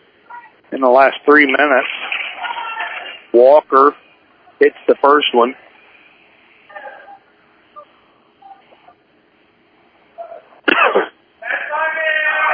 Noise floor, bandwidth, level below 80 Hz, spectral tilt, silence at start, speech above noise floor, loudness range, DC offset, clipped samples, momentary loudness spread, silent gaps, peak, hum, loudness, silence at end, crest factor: -54 dBFS; 5.2 kHz; -70 dBFS; -6 dB/octave; 0.3 s; 43 dB; 7 LU; under 0.1%; under 0.1%; 24 LU; none; 0 dBFS; none; -14 LUFS; 0 s; 16 dB